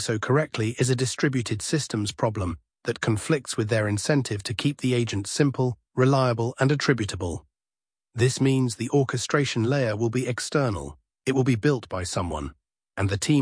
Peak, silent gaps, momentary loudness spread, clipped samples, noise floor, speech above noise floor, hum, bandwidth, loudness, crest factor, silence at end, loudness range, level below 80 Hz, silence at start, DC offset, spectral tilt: -6 dBFS; none; 9 LU; under 0.1%; under -90 dBFS; over 66 dB; none; 10.5 kHz; -25 LUFS; 18 dB; 0 s; 2 LU; -50 dBFS; 0 s; under 0.1%; -5.5 dB/octave